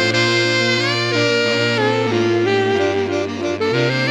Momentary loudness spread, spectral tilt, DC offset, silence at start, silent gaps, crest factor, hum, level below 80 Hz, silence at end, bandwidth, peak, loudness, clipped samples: 5 LU; -4.5 dB/octave; under 0.1%; 0 s; none; 14 dB; none; -64 dBFS; 0 s; 11.5 kHz; -4 dBFS; -17 LUFS; under 0.1%